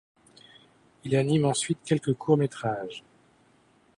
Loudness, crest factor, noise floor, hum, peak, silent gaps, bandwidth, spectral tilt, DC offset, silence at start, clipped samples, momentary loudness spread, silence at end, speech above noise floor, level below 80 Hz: -26 LUFS; 20 dB; -62 dBFS; none; -10 dBFS; none; 11 kHz; -5.5 dB/octave; under 0.1%; 1.05 s; under 0.1%; 15 LU; 1 s; 37 dB; -66 dBFS